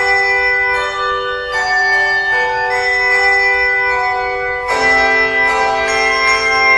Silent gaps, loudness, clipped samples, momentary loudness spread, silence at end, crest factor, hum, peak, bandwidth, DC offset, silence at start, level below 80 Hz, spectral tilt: none; -12 LUFS; under 0.1%; 7 LU; 0 s; 14 dB; none; 0 dBFS; 12 kHz; under 0.1%; 0 s; -40 dBFS; -1.5 dB/octave